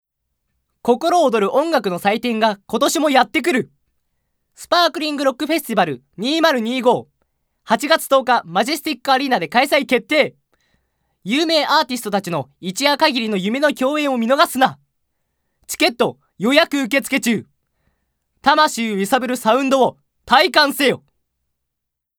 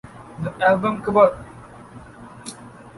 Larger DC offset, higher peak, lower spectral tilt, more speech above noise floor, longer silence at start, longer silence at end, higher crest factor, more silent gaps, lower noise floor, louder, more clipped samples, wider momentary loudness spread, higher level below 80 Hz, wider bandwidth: neither; about the same, 0 dBFS vs -2 dBFS; second, -3.5 dB/octave vs -6 dB/octave; first, 63 dB vs 23 dB; first, 0.85 s vs 0.05 s; first, 1.2 s vs 0.1 s; about the same, 18 dB vs 20 dB; neither; first, -80 dBFS vs -42 dBFS; about the same, -17 LUFS vs -19 LUFS; neither; second, 7 LU vs 25 LU; second, -62 dBFS vs -52 dBFS; first, over 20 kHz vs 11.5 kHz